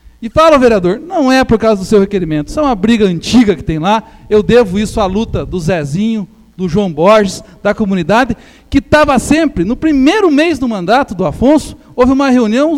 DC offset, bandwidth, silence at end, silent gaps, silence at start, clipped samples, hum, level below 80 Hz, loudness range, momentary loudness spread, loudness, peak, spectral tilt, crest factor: under 0.1%; 14.5 kHz; 0 s; none; 0.2 s; under 0.1%; none; -30 dBFS; 3 LU; 8 LU; -11 LUFS; 0 dBFS; -6 dB/octave; 10 dB